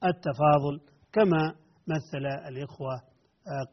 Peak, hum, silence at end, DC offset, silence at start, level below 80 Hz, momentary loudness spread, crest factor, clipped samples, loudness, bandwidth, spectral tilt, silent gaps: -10 dBFS; none; 0.05 s; under 0.1%; 0 s; -62 dBFS; 16 LU; 18 dB; under 0.1%; -28 LUFS; 6.2 kHz; -6 dB/octave; none